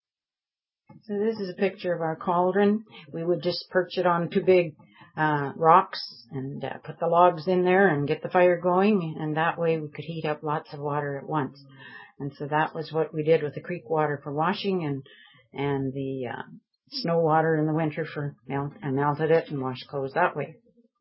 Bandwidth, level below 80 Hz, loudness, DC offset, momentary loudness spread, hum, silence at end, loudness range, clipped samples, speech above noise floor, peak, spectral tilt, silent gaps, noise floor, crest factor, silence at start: 5.8 kHz; -68 dBFS; -26 LUFS; under 0.1%; 14 LU; none; 0.5 s; 7 LU; under 0.1%; over 64 dB; -4 dBFS; -10.5 dB/octave; none; under -90 dBFS; 22 dB; 0.95 s